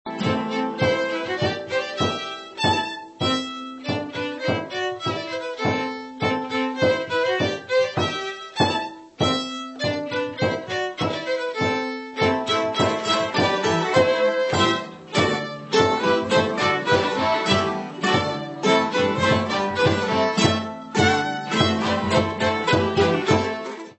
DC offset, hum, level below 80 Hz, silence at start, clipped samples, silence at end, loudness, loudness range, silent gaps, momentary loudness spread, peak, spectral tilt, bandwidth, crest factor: under 0.1%; none; -54 dBFS; 0.05 s; under 0.1%; 0.05 s; -22 LUFS; 4 LU; none; 8 LU; -4 dBFS; -4.5 dB/octave; 8.4 kHz; 18 dB